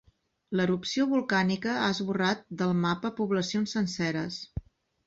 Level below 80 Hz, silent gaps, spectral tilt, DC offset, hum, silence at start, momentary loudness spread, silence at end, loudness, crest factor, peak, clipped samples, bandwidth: -54 dBFS; none; -5.5 dB/octave; under 0.1%; none; 0.5 s; 7 LU; 0.45 s; -29 LUFS; 16 dB; -14 dBFS; under 0.1%; 7.8 kHz